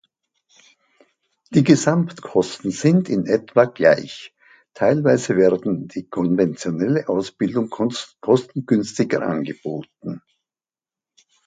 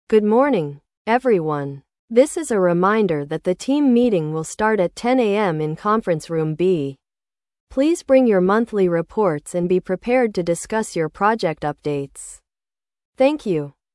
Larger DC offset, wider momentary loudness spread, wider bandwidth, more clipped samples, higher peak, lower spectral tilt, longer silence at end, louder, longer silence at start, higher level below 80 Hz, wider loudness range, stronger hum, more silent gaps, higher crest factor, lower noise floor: neither; first, 13 LU vs 10 LU; second, 9.4 kHz vs 12 kHz; neither; about the same, 0 dBFS vs -2 dBFS; about the same, -6.5 dB/octave vs -6 dB/octave; first, 1.3 s vs 0.25 s; about the same, -20 LUFS vs -19 LUFS; first, 1.5 s vs 0.1 s; second, -60 dBFS vs -54 dBFS; about the same, 5 LU vs 4 LU; neither; second, none vs 0.97-1.05 s, 1.99-2.08 s, 7.60-7.67 s, 13.05-13.13 s; about the same, 20 dB vs 16 dB; about the same, under -90 dBFS vs under -90 dBFS